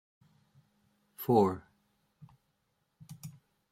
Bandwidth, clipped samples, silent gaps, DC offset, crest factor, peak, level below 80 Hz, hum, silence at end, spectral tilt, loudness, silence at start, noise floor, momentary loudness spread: 16 kHz; under 0.1%; none; under 0.1%; 24 dB; -14 dBFS; -74 dBFS; none; 0.4 s; -8 dB/octave; -30 LUFS; 1.2 s; -79 dBFS; 24 LU